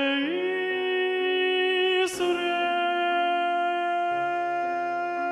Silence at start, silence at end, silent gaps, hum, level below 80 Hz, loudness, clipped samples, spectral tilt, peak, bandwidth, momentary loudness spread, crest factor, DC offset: 0 s; 0 s; none; none; -72 dBFS; -25 LUFS; under 0.1%; -2.5 dB/octave; -14 dBFS; 13 kHz; 5 LU; 12 dB; under 0.1%